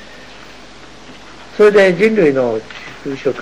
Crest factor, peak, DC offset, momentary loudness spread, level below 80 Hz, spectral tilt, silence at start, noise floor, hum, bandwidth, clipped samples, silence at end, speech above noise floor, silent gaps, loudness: 14 dB; -2 dBFS; 0.9%; 26 LU; -50 dBFS; -6 dB/octave; 0.15 s; -38 dBFS; none; 10.5 kHz; under 0.1%; 0 s; 26 dB; none; -13 LUFS